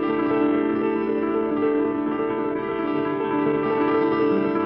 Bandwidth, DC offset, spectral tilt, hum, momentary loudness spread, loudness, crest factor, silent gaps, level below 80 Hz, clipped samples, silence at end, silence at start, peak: 5.4 kHz; under 0.1%; -9.5 dB/octave; none; 4 LU; -23 LUFS; 12 dB; none; -56 dBFS; under 0.1%; 0 s; 0 s; -10 dBFS